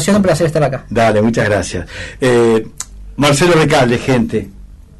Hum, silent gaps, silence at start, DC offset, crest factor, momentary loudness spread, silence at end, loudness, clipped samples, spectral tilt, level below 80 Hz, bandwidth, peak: none; none; 0 s; under 0.1%; 12 dB; 15 LU; 0.25 s; -13 LUFS; under 0.1%; -5.5 dB/octave; -36 dBFS; 12.5 kHz; -2 dBFS